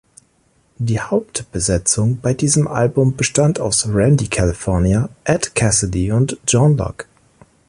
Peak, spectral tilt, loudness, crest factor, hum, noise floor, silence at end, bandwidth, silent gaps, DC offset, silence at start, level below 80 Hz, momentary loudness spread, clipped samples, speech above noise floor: -2 dBFS; -5 dB/octave; -17 LUFS; 16 dB; none; -59 dBFS; 0.65 s; 11.5 kHz; none; under 0.1%; 0.8 s; -34 dBFS; 6 LU; under 0.1%; 42 dB